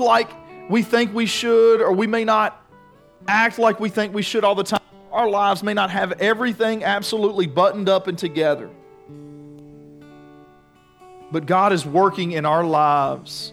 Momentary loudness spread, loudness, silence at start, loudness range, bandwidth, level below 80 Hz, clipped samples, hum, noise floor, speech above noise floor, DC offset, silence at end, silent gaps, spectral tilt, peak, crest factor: 8 LU; -19 LUFS; 0 s; 7 LU; 15.5 kHz; -64 dBFS; under 0.1%; none; -53 dBFS; 34 dB; under 0.1%; 0 s; none; -5 dB/octave; -4 dBFS; 16 dB